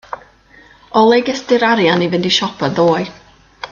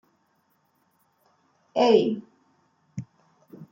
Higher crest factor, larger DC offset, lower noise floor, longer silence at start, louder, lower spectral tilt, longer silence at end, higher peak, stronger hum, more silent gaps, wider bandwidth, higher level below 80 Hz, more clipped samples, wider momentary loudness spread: second, 16 dB vs 24 dB; neither; second, -45 dBFS vs -69 dBFS; second, 0.1 s vs 1.75 s; first, -14 LUFS vs -23 LUFS; about the same, -5 dB/octave vs -6 dB/octave; about the same, 0.05 s vs 0.05 s; first, 0 dBFS vs -6 dBFS; neither; neither; about the same, 7.4 kHz vs 7.4 kHz; first, -54 dBFS vs -76 dBFS; neither; second, 17 LU vs 21 LU